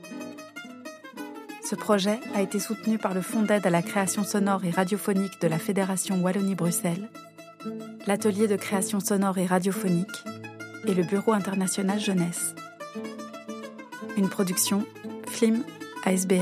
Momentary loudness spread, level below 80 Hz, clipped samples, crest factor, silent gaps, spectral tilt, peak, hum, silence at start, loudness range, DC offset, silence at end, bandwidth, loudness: 15 LU; -78 dBFS; under 0.1%; 18 dB; none; -5 dB/octave; -8 dBFS; none; 0 s; 3 LU; under 0.1%; 0 s; 15.5 kHz; -26 LUFS